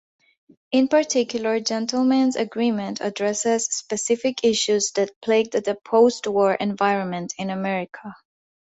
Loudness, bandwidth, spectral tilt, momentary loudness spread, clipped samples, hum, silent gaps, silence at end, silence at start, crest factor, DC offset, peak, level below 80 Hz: -22 LUFS; 8.2 kHz; -3.5 dB/octave; 8 LU; under 0.1%; none; 5.16-5.21 s; 0.5 s; 0.7 s; 16 dB; under 0.1%; -6 dBFS; -66 dBFS